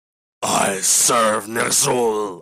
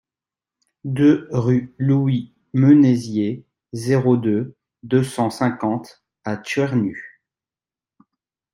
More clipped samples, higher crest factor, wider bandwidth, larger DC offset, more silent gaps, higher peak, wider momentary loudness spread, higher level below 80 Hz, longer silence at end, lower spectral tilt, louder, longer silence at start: neither; about the same, 16 dB vs 18 dB; first, 16 kHz vs 12 kHz; neither; neither; about the same, -4 dBFS vs -2 dBFS; second, 8 LU vs 15 LU; about the same, -60 dBFS vs -60 dBFS; second, 0 s vs 1.45 s; second, -1.5 dB/octave vs -8 dB/octave; first, -16 LUFS vs -19 LUFS; second, 0.4 s vs 0.85 s